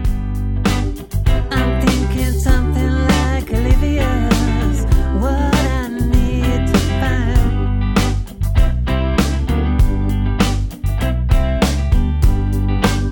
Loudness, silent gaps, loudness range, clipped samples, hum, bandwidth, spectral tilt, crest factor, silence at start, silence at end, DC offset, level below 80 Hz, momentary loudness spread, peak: -17 LUFS; none; 1 LU; under 0.1%; none; 17.5 kHz; -6 dB/octave; 14 dB; 0 s; 0 s; under 0.1%; -18 dBFS; 4 LU; 0 dBFS